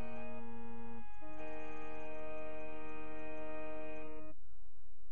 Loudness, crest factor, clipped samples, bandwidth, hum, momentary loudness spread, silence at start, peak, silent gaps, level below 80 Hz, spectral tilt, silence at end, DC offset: -49 LUFS; 12 dB; under 0.1%; 6.8 kHz; none; 13 LU; 0 s; -28 dBFS; none; -62 dBFS; -6 dB/octave; 0 s; 3%